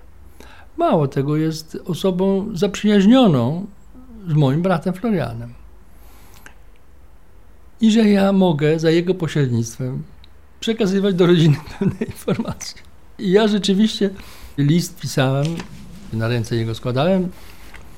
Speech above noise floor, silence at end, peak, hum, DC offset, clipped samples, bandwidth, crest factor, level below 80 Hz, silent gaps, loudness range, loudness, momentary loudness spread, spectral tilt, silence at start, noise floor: 30 dB; 0.15 s; -2 dBFS; none; 0.8%; under 0.1%; 16 kHz; 16 dB; -46 dBFS; none; 5 LU; -18 LUFS; 15 LU; -6.5 dB/octave; 0.75 s; -48 dBFS